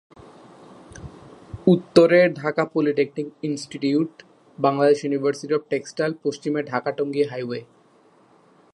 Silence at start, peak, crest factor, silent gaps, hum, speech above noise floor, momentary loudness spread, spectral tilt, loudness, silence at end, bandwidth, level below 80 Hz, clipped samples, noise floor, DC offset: 0.95 s; 0 dBFS; 22 dB; none; none; 35 dB; 15 LU; -6.5 dB/octave; -22 LUFS; 1.1 s; 11 kHz; -58 dBFS; under 0.1%; -56 dBFS; under 0.1%